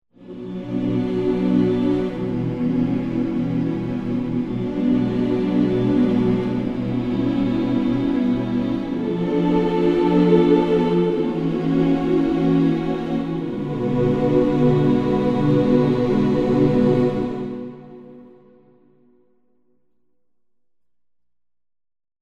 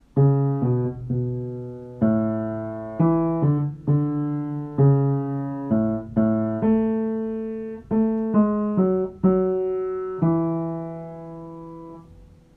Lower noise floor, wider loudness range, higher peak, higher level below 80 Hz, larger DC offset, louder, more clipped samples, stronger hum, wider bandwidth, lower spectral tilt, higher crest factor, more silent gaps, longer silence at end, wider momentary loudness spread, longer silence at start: first, -84 dBFS vs -48 dBFS; about the same, 4 LU vs 2 LU; first, -4 dBFS vs -8 dBFS; first, -44 dBFS vs -52 dBFS; first, 0.1% vs under 0.1%; first, -20 LUFS vs -23 LUFS; neither; first, 60 Hz at -45 dBFS vs none; first, 7.4 kHz vs 2.9 kHz; second, -9 dB/octave vs -13 dB/octave; about the same, 16 dB vs 16 dB; neither; first, 4 s vs 0.3 s; second, 8 LU vs 14 LU; about the same, 0.2 s vs 0.15 s